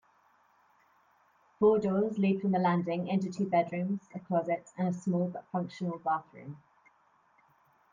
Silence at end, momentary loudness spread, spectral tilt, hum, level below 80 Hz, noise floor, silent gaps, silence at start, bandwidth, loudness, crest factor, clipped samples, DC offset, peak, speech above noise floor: 1.35 s; 9 LU; -8.5 dB/octave; none; -74 dBFS; -68 dBFS; none; 1.6 s; 7.6 kHz; -31 LUFS; 18 dB; under 0.1%; under 0.1%; -14 dBFS; 37 dB